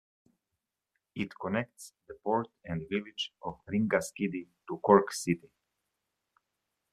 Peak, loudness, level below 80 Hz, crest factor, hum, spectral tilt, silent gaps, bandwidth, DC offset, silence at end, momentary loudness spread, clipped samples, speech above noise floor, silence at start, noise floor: -6 dBFS; -32 LUFS; -68 dBFS; 28 dB; none; -5 dB/octave; none; 13.5 kHz; under 0.1%; 1.55 s; 18 LU; under 0.1%; 55 dB; 1.15 s; -87 dBFS